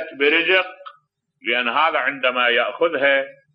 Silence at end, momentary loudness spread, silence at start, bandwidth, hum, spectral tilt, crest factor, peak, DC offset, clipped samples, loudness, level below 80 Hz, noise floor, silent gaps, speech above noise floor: 0.2 s; 5 LU; 0 s; 5.6 kHz; none; -5.5 dB/octave; 16 dB; -4 dBFS; under 0.1%; under 0.1%; -18 LUFS; -86 dBFS; -61 dBFS; none; 42 dB